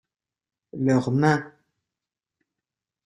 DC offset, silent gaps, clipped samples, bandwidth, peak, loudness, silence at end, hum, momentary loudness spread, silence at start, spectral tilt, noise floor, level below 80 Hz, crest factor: under 0.1%; none; under 0.1%; 11 kHz; -8 dBFS; -23 LUFS; 1.55 s; none; 8 LU; 0.75 s; -7.5 dB/octave; -88 dBFS; -64 dBFS; 20 dB